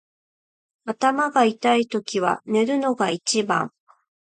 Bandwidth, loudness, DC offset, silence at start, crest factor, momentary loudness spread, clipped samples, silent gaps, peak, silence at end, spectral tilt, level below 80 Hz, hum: 9.4 kHz; -21 LUFS; under 0.1%; 0.85 s; 18 dB; 6 LU; under 0.1%; none; -4 dBFS; 0.65 s; -3.5 dB/octave; -72 dBFS; none